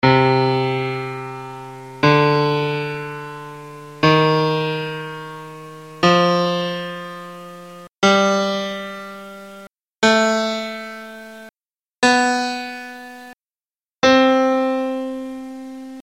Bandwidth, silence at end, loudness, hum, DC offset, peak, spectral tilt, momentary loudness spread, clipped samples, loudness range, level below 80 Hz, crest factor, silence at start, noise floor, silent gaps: 16.5 kHz; 0 s; -18 LUFS; none; 0.1%; -2 dBFS; -5 dB/octave; 21 LU; under 0.1%; 4 LU; -56 dBFS; 18 dB; 0.05 s; under -90 dBFS; 11.91-11.95 s, 13.44-13.48 s, 13.66-13.70 s